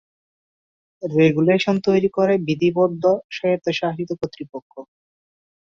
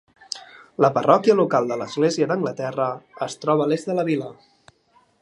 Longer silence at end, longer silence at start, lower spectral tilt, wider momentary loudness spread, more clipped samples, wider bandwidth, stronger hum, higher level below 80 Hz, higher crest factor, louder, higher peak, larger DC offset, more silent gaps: about the same, 0.85 s vs 0.9 s; first, 1 s vs 0.3 s; about the same, -7 dB/octave vs -6 dB/octave; second, 13 LU vs 17 LU; neither; second, 7.4 kHz vs 11.5 kHz; neither; first, -60 dBFS vs -72 dBFS; about the same, 18 dB vs 20 dB; about the same, -20 LUFS vs -21 LUFS; about the same, -2 dBFS vs -2 dBFS; neither; first, 3.24-3.29 s, 4.62-4.70 s vs none